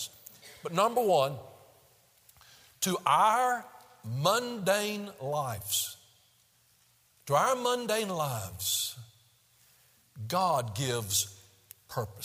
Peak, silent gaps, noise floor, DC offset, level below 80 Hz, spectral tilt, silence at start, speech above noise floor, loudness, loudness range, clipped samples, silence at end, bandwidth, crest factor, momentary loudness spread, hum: -10 dBFS; none; -66 dBFS; under 0.1%; -72 dBFS; -3 dB/octave; 0 s; 37 dB; -30 LUFS; 4 LU; under 0.1%; 0 s; 16 kHz; 22 dB; 18 LU; none